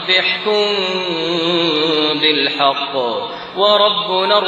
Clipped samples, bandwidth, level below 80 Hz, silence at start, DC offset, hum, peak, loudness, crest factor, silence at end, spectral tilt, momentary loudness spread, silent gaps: under 0.1%; 9.2 kHz; -62 dBFS; 0 s; under 0.1%; none; 0 dBFS; -15 LUFS; 16 dB; 0 s; -4.5 dB/octave; 6 LU; none